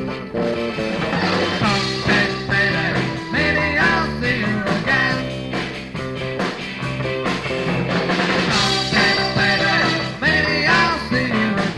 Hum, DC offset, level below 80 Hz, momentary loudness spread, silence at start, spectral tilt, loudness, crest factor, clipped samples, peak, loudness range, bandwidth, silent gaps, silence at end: none; under 0.1%; -40 dBFS; 9 LU; 0 s; -4.5 dB/octave; -18 LUFS; 16 dB; under 0.1%; -4 dBFS; 5 LU; 11.5 kHz; none; 0 s